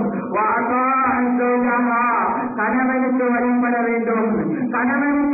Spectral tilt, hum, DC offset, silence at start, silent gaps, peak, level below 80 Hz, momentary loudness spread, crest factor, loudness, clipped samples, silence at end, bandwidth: -15 dB/octave; none; under 0.1%; 0 s; none; -10 dBFS; -54 dBFS; 3 LU; 8 dB; -18 LUFS; under 0.1%; 0 s; 2.7 kHz